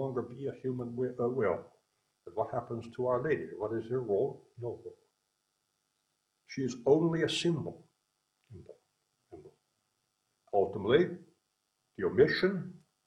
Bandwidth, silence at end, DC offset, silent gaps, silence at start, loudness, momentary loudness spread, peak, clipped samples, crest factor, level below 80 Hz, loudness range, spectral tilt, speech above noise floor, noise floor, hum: 10.5 kHz; 0.3 s; under 0.1%; none; 0 s; -32 LUFS; 17 LU; -12 dBFS; under 0.1%; 22 dB; -68 dBFS; 7 LU; -6 dB/octave; 49 dB; -81 dBFS; none